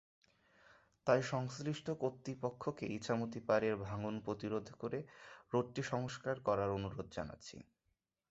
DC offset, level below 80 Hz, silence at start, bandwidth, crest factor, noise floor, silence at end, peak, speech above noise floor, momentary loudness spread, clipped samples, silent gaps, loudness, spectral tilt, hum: under 0.1%; -66 dBFS; 1.05 s; 8 kHz; 22 dB; -85 dBFS; 0.7 s; -18 dBFS; 46 dB; 11 LU; under 0.1%; none; -40 LUFS; -5.5 dB/octave; none